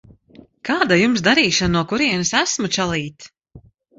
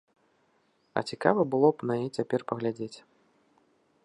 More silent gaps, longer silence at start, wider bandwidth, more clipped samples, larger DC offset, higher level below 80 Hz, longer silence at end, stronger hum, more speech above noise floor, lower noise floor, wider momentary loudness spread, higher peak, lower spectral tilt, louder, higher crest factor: neither; second, 0.65 s vs 0.95 s; second, 8 kHz vs 11 kHz; neither; neither; first, -44 dBFS vs -76 dBFS; second, 0.4 s vs 1.05 s; neither; second, 30 dB vs 42 dB; second, -48 dBFS vs -70 dBFS; second, 10 LU vs 14 LU; first, -2 dBFS vs -6 dBFS; second, -3.5 dB/octave vs -7 dB/octave; first, -17 LUFS vs -28 LUFS; second, 18 dB vs 24 dB